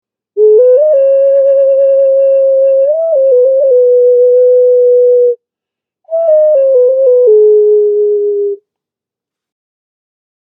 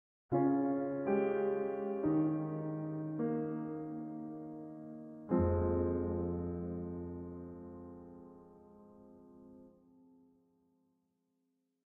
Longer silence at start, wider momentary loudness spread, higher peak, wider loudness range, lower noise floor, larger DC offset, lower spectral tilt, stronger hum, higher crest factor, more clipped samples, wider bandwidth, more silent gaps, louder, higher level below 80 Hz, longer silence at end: about the same, 0.35 s vs 0.3 s; second, 7 LU vs 17 LU; first, 0 dBFS vs -18 dBFS; second, 2 LU vs 17 LU; about the same, -85 dBFS vs -82 dBFS; neither; second, -7.5 dB/octave vs -10.5 dB/octave; neither; second, 8 dB vs 20 dB; neither; second, 2.9 kHz vs 3.4 kHz; neither; first, -8 LUFS vs -36 LUFS; second, -80 dBFS vs -58 dBFS; second, 1.9 s vs 2.15 s